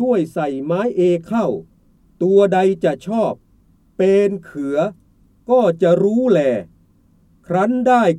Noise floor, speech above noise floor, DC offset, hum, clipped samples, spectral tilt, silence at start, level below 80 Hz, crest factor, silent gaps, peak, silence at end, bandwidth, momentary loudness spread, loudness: -54 dBFS; 38 dB; under 0.1%; none; under 0.1%; -7.5 dB/octave; 0 s; -56 dBFS; 16 dB; none; -2 dBFS; 0 s; 11 kHz; 9 LU; -17 LUFS